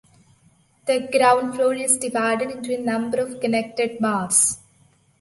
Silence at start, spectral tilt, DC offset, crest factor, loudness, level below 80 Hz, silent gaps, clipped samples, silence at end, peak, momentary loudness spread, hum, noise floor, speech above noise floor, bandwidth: 0.85 s; -2.5 dB/octave; under 0.1%; 20 dB; -21 LUFS; -64 dBFS; none; under 0.1%; 0.65 s; -4 dBFS; 9 LU; none; -58 dBFS; 37 dB; 12 kHz